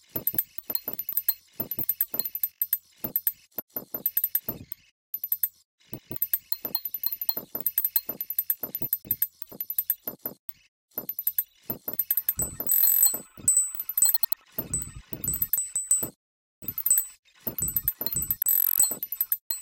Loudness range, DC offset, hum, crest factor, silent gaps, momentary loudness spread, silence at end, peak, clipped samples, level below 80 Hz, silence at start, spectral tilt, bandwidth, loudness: 7 LU; under 0.1%; none; 24 dB; 3.62-3.68 s, 4.91-5.13 s, 5.65-5.78 s, 10.39-10.48 s, 10.68-10.89 s, 16.16-16.62 s, 17.19-17.23 s, 19.41-19.50 s; 14 LU; 0 s; -6 dBFS; under 0.1%; -56 dBFS; 0.15 s; -1.5 dB/octave; 17.5 kHz; -25 LUFS